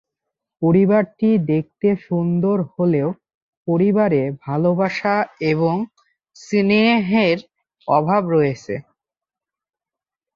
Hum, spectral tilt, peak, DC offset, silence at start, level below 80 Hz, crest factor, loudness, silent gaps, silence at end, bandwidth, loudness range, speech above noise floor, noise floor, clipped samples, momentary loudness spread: none; -8 dB/octave; -4 dBFS; under 0.1%; 0.6 s; -58 dBFS; 16 dB; -18 LUFS; 3.34-3.65 s; 1.55 s; 7.4 kHz; 1 LU; 71 dB; -89 dBFS; under 0.1%; 10 LU